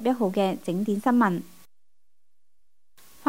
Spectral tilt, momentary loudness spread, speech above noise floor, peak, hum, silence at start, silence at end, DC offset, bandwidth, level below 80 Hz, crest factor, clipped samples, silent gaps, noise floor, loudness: -7 dB/octave; 6 LU; 61 dB; -8 dBFS; none; 0 s; 0 s; 0.4%; 16 kHz; -70 dBFS; 18 dB; under 0.1%; none; -85 dBFS; -25 LUFS